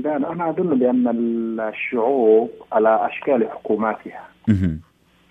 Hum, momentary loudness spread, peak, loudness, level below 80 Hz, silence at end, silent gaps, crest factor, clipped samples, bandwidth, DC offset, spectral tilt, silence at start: none; 8 LU; -4 dBFS; -20 LUFS; -50 dBFS; 0.5 s; none; 16 dB; under 0.1%; 3.9 kHz; under 0.1%; -9.5 dB/octave; 0 s